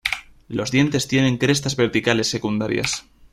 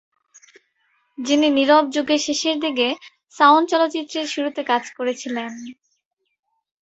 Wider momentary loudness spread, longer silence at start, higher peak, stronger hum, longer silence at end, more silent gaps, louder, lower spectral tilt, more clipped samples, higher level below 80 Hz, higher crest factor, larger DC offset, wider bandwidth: second, 9 LU vs 15 LU; second, 0.05 s vs 1.2 s; about the same, -2 dBFS vs -2 dBFS; neither; second, 0.3 s vs 1.1 s; neither; about the same, -21 LUFS vs -19 LUFS; first, -4.5 dB/octave vs -1.5 dB/octave; neither; first, -50 dBFS vs -70 dBFS; about the same, 18 dB vs 20 dB; neither; first, 15.5 kHz vs 8.2 kHz